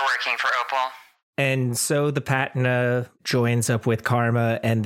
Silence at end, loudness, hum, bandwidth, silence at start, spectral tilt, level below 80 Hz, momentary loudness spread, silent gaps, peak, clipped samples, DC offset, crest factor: 0 s; -23 LUFS; none; 16 kHz; 0 s; -5 dB/octave; -64 dBFS; 4 LU; 1.23-1.33 s; -6 dBFS; under 0.1%; under 0.1%; 18 dB